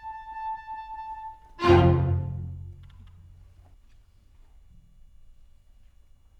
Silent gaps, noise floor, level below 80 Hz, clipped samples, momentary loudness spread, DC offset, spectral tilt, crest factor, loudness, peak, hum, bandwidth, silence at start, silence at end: none; -55 dBFS; -44 dBFS; under 0.1%; 24 LU; under 0.1%; -8.5 dB/octave; 24 dB; -26 LUFS; -6 dBFS; none; 7 kHz; 0 s; 1.1 s